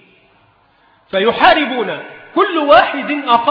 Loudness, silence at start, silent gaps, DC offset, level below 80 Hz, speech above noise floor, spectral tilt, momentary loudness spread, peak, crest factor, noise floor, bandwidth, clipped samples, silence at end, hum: -13 LUFS; 1.15 s; none; under 0.1%; -50 dBFS; 40 dB; -6.5 dB/octave; 12 LU; 0 dBFS; 14 dB; -53 dBFS; 5.4 kHz; under 0.1%; 0 s; none